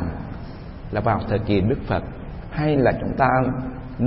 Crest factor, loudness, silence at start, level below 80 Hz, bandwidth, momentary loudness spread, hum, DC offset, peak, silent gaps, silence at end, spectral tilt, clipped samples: 18 dB; -22 LUFS; 0 s; -36 dBFS; 5.8 kHz; 16 LU; none; under 0.1%; -4 dBFS; none; 0 s; -12 dB/octave; under 0.1%